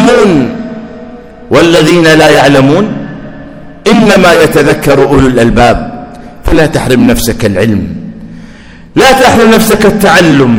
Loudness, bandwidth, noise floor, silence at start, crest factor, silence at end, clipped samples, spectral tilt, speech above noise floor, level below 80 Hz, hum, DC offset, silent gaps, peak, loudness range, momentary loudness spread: -6 LUFS; over 20 kHz; -30 dBFS; 0 s; 6 dB; 0 s; 10%; -5 dB/octave; 25 dB; -24 dBFS; none; under 0.1%; none; 0 dBFS; 3 LU; 19 LU